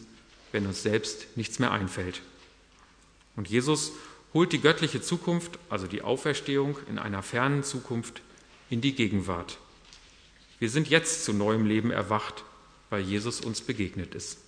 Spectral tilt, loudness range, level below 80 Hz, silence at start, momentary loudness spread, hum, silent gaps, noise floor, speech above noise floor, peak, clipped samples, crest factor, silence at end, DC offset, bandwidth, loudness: -4.5 dB/octave; 4 LU; -60 dBFS; 0 s; 13 LU; none; none; -59 dBFS; 30 dB; -4 dBFS; under 0.1%; 26 dB; 0.1 s; under 0.1%; 11 kHz; -29 LUFS